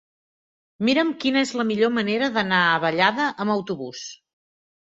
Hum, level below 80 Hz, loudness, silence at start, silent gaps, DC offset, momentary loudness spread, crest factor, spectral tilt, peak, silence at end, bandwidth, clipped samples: none; -66 dBFS; -21 LUFS; 0.8 s; none; under 0.1%; 12 LU; 20 dB; -4.5 dB/octave; -2 dBFS; 0.7 s; 8 kHz; under 0.1%